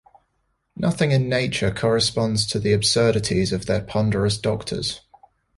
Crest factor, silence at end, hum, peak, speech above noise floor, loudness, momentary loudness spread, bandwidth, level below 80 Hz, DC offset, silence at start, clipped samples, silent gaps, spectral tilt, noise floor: 16 dB; 0.6 s; none; -6 dBFS; 50 dB; -21 LUFS; 7 LU; 11.5 kHz; -44 dBFS; under 0.1%; 0.75 s; under 0.1%; none; -5 dB/octave; -71 dBFS